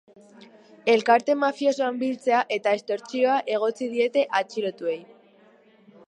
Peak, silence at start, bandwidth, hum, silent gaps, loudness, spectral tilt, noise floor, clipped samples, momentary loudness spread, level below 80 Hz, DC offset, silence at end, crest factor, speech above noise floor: -6 dBFS; 0.85 s; 10.5 kHz; none; none; -24 LUFS; -4 dB/octave; -56 dBFS; under 0.1%; 9 LU; -84 dBFS; under 0.1%; 1.05 s; 20 dB; 32 dB